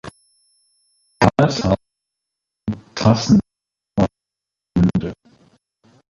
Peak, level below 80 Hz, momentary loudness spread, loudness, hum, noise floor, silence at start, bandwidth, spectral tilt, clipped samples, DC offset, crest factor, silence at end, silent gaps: -2 dBFS; -42 dBFS; 13 LU; -19 LUFS; 50 Hz at -40 dBFS; -85 dBFS; 0.05 s; 11.5 kHz; -6.5 dB/octave; under 0.1%; under 0.1%; 18 dB; 0.95 s; none